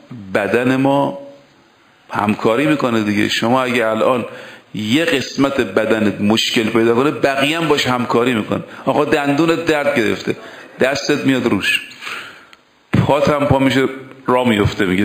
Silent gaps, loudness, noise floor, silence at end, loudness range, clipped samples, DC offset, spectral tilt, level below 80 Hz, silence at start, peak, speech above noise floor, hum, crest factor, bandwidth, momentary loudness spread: none; -16 LUFS; -50 dBFS; 0 s; 2 LU; under 0.1%; under 0.1%; -5.5 dB/octave; -46 dBFS; 0.1 s; -2 dBFS; 35 dB; none; 16 dB; 15.5 kHz; 10 LU